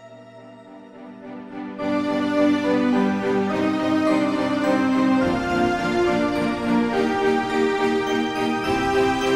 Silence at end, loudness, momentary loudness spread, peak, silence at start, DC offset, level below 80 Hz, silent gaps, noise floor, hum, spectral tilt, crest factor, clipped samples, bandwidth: 0 s; -21 LUFS; 9 LU; -8 dBFS; 0 s; under 0.1%; -48 dBFS; none; -43 dBFS; none; -5.5 dB/octave; 14 dB; under 0.1%; 13.5 kHz